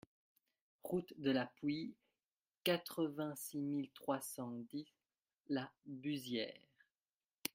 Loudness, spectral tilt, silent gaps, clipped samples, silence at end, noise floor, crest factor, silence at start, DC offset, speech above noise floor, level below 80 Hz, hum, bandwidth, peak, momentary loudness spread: -43 LUFS; -4.5 dB/octave; 2.32-2.46 s, 2.57-2.61 s, 7.02-7.06 s, 7.14-7.20 s, 7.34-7.38 s; under 0.1%; 0.05 s; under -90 dBFS; 24 dB; 0.85 s; under 0.1%; over 48 dB; -84 dBFS; none; 16 kHz; -20 dBFS; 12 LU